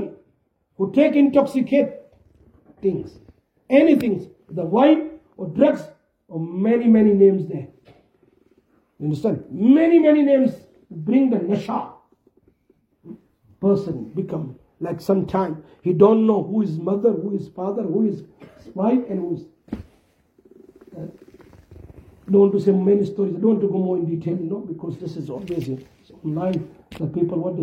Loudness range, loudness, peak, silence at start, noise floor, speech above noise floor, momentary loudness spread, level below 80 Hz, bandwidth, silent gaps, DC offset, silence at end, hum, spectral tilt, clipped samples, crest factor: 9 LU; -20 LUFS; -2 dBFS; 0 s; -66 dBFS; 46 dB; 18 LU; -58 dBFS; 8.6 kHz; none; under 0.1%; 0 s; none; -9 dB/octave; under 0.1%; 20 dB